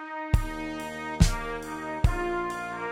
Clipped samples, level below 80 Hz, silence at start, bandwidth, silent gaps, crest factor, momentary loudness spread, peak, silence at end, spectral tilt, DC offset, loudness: under 0.1%; -32 dBFS; 0 s; 16 kHz; none; 22 dB; 9 LU; -6 dBFS; 0 s; -5.5 dB/octave; under 0.1%; -29 LUFS